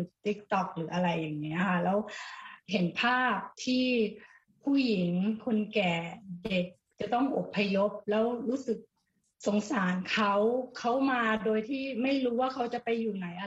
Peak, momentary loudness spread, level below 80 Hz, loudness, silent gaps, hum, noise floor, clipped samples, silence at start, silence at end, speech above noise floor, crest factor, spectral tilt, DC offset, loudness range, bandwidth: -14 dBFS; 8 LU; -68 dBFS; -30 LUFS; none; none; -77 dBFS; under 0.1%; 0 s; 0 s; 47 dB; 16 dB; -6 dB/octave; under 0.1%; 2 LU; 8 kHz